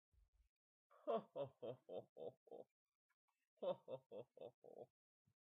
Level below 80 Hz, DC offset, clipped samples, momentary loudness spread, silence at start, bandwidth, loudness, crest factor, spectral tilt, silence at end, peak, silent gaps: -90 dBFS; under 0.1%; under 0.1%; 16 LU; 0.9 s; 3.9 kHz; -53 LUFS; 22 dB; -5 dB/octave; 0.6 s; -32 dBFS; 2.09-2.16 s, 2.37-2.46 s, 2.71-2.86 s, 2.95-3.28 s, 3.47-3.57 s, 4.06-4.10 s, 4.54-4.62 s